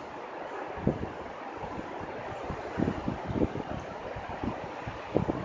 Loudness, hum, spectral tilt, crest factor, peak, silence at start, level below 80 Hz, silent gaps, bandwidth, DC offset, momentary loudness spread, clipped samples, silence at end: -35 LUFS; none; -7.5 dB/octave; 26 dB; -8 dBFS; 0 s; -48 dBFS; none; 7.6 kHz; under 0.1%; 8 LU; under 0.1%; 0 s